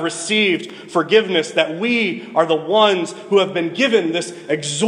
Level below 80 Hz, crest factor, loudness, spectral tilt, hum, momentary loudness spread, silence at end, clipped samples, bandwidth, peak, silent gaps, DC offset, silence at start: -72 dBFS; 16 dB; -17 LUFS; -3.5 dB/octave; none; 8 LU; 0 s; under 0.1%; 11 kHz; -2 dBFS; none; under 0.1%; 0 s